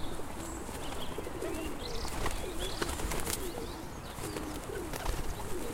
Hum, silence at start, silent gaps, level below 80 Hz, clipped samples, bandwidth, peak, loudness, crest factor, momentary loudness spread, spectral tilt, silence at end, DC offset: none; 0 s; none; -42 dBFS; under 0.1%; 16.5 kHz; -10 dBFS; -38 LUFS; 26 dB; 6 LU; -4 dB/octave; 0 s; under 0.1%